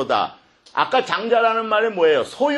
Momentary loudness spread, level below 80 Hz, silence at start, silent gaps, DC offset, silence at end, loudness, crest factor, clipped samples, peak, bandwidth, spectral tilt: 6 LU; -66 dBFS; 0 s; none; under 0.1%; 0 s; -19 LUFS; 16 dB; under 0.1%; -2 dBFS; 11.5 kHz; -4 dB/octave